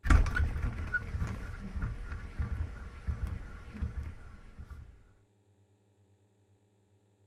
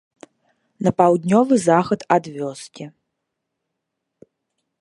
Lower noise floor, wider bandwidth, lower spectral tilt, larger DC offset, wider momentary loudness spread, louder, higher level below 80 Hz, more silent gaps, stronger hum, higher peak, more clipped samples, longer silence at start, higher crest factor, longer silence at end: second, -69 dBFS vs -79 dBFS; about the same, 10.5 kHz vs 11.5 kHz; about the same, -6.5 dB/octave vs -6.5 dB/octave; neither; about the same, 18 LU vs 20 LU; second, -37 LUFS vs -18 LUFS; first, -38 dBFS vs -60 dBFS; neither; neither; second, -10 dBFS vs 0 dBFS; neither; second, 0.05 s vs 0.8 s; about the same, 24 dB vs 20 dB; first, 2.3 s vs 1.9 s